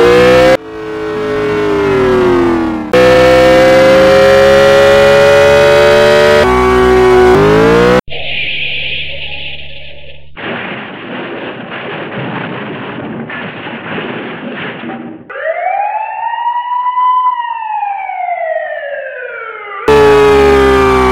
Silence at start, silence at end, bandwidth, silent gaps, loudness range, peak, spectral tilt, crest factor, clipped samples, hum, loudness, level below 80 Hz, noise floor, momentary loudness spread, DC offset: 0 s; 0 s; 16 kHz; none; 15 LU; 0 dBFS; -5.5 dB/octave; 10 dB; 1%; none; -9 LUFS; -30 dBFS; -33 dBFS; 17 LU; under 0.1%